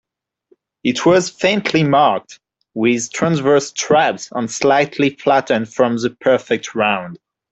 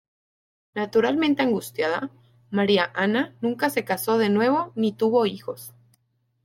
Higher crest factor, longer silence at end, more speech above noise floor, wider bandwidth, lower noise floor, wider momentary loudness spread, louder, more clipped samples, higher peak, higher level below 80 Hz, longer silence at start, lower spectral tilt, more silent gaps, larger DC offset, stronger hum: about the same, 14 dB vs 18 dB; second, 0.35 s vs 0.75 s; second, 42 dB vs 46 dB; second, 8.2 kHz vs 16.5 kHz; second, -58 dBFS vs -69 dBFS; second, 8 LU vs 14 LU; first, -16 LUFS vs -23 LUFS; neither; first, -2 dBFS vs -6 dBFS; first, -58 dBFS vs -70 dBFS; about the same, 0.85 s vs 0.75 s; about the same, -4.5 dB/octave vs -5 dB/octave; neither; neither; neither